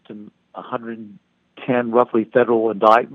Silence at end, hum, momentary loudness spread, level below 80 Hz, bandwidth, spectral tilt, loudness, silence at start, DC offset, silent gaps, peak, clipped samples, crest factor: 0 s; none; 23 LU; -70 dBFS; 6.8 kHz; -7.5 dB/octave; -18 LUFS; 0.1 s; under 0.1%; none; 0 dBFS; under 0.1%; 20 dB